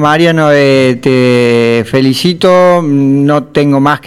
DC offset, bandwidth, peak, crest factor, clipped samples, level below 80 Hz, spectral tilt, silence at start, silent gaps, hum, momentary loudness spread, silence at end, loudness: under 0.1%; 14.5 kHz; 0 dBFS; 8 dB; 0.3%; -48 dBFS; -6.5 dB/octave; 0 s; none; none; 3 LU; 0 s; -8 LUFS